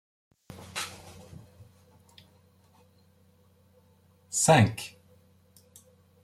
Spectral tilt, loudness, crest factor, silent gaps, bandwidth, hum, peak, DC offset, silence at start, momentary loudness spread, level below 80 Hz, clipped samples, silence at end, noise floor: -4.5 dB/octave; -26 LUFS; 26 dB; none; 15.5 kHz; none; -8 dBFS; under 0.1%; 0.75 s; 30 LU; -66 dBFS; under 0.1%; 1.35 s; -62 dBFS